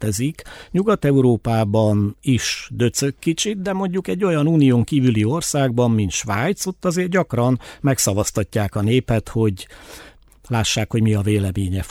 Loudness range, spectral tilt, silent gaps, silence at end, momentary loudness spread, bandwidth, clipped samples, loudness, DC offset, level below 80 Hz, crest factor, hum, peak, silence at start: 3 LU; -5.5 dB/octave; none; 0 s; 7 LU; 16.5 kHz; under 0.1%; -19 LUFS; under 0.1%; -44 dBFS; 14 dB; none; -4 dBFS; 0 s